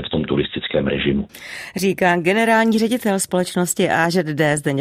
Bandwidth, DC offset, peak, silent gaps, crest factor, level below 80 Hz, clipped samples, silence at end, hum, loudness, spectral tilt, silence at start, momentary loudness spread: 16 kHz; under 0.1%; -2 dBFS; none; 16 dB; -46 dBFS; under 0.1%; 0 s; none; -18 LUFS; -4.5 dB/octave; 0 s; 6 LU